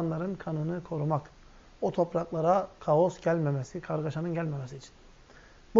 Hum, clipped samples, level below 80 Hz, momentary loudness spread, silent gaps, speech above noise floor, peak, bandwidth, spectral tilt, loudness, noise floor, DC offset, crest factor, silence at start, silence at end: none; under 0.1%; -58 dBFS; 9 LU; none; 25 dB; -8 dBFS; 7.6 kHz; -8 dB/octave; -30 LUFS; -54 dBFS; under 0.1%; 22 dB; 0 s; 0 s